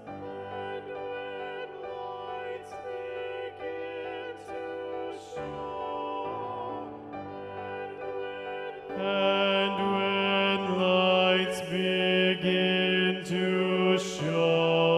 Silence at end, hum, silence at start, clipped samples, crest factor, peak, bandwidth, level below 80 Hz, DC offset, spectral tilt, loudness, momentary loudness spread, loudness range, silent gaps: 0 s; none; 0 s; under 0.1%; 18 dB; -12 dBFS; 12.5 kHz; -68 dBFS; under 0.1%; -5.5 dB/octave; -29 LUFS; 14 LU; 12 LU; none